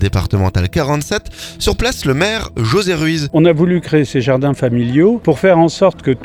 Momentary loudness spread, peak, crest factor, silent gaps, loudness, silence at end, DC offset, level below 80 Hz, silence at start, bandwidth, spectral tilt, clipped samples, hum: 7 LU; 0 dBFS; 14 dB; none; -14 LUFS; 0 s; under 0.1%; -30 dBFS; 0 s; 19 kHz; -6 dB/octave; under 0.1%; none